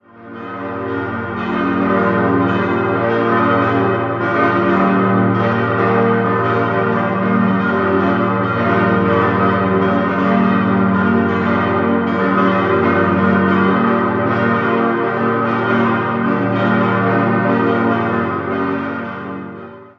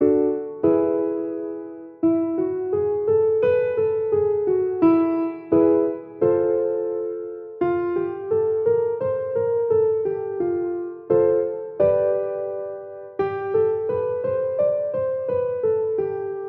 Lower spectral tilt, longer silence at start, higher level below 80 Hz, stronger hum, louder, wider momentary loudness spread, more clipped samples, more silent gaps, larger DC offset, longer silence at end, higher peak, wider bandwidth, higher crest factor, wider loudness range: second, -9 dB/octave vs -11 dB/octave; first, 0.15 s vs 0 s; first, -42 dBFS vs -60 dBFS; neither; first, -15 LUFS vs -22 LUFS; about the same, 8 LU vs 9 LU; neither; neither; neither; about the same, 0.1 s vs 0 s; first, 0 dBFS vs -6 dBFS; first, 6 kHz vs 3.7 kHz; about the same, 14 dB vs 16 dB; about the same, 2 LU vs 3 LU